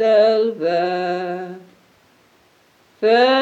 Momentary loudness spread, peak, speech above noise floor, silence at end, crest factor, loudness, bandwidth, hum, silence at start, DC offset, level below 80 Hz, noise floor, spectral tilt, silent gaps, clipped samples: 16 LU; -4 dBFS; 39 dB; 0 s; 14 dB; -18 LUFS; 8.2 kHz; none; 0 s; under 0.1%; -76 dBFS; -56 dBFS; -5.5 dB/octave; none; under 0.1%